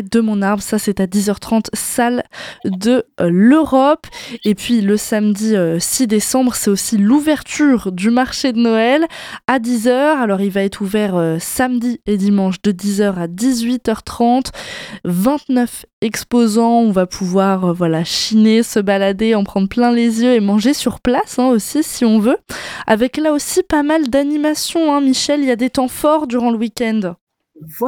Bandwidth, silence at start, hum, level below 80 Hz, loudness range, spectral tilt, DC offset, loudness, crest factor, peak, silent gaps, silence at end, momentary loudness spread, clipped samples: 19 kHz; 0 s; none; -46 dBFS; 3 LU; -5 dB/octave; under 0.1%; -15 LUFS; 14 dB; -2 dBFS; 15.93-16.02 s, 27.21-27.27 s; 0 s; 6 LU; under 0.1%